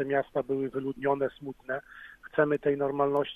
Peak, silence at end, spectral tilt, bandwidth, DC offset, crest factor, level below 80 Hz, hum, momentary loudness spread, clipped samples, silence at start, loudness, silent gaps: -12 dBFS; 0 s; -8 dB/octave; 3.9 kHz; under 0.1%; 18 dB; -64 dBFS; none; 11 LU; under 0.1%; 0 s; -30 LUFS; none